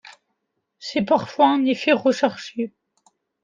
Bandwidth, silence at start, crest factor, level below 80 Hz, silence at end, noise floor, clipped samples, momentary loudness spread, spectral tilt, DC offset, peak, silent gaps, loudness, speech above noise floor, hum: 7.6 kHz; 0.8 s; 18 dB; -70 dBFS; 0.75 s; -76 dBFS; under 0.1%; 12 LU; -5 dB/octave; under 0.1%; -4 dBFS; none; -21 LUFS; 56 dB; none